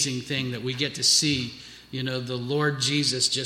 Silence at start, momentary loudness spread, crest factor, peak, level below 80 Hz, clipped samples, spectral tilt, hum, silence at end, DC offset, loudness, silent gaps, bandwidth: 0 s; 13 LU; 18 dB; -8 dBFS; -60 dBFS; under 0.1%; -3 dB/octave; none; 0 s; under 0.1%; -24 LUFS; none; 15.5 kHz